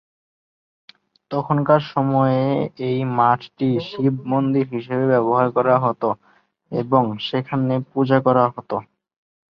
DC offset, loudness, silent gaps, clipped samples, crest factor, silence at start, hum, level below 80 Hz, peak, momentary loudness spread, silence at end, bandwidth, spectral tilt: under 0.1%; -20 LUFS; none; under 0.1%; 18 dB; 1.3 s; none; -62 dBFS; -2 dBFS; 9 LU; 0.7 s; 6 kHz; -9.5 dB/octave